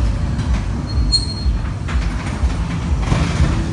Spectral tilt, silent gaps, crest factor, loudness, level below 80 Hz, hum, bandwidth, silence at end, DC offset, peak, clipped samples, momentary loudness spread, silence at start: -5.5 dB/octave; none; 14 dB; -20 LUFS; -20 dBFS; none; 11 kHz; 0 s; under 0.1%; -4 dBFS; under 0.1%; 5 LU; 0 s